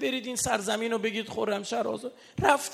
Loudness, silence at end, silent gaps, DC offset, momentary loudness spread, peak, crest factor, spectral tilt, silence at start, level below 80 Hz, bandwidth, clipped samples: -29 LUFS; 0 s; none; under 0.1%; 7 LU; -4 dBFS; 24 dB; -3 dB/octave; 0 s; -58 dBFS; 15.5 kHz; under 0.1%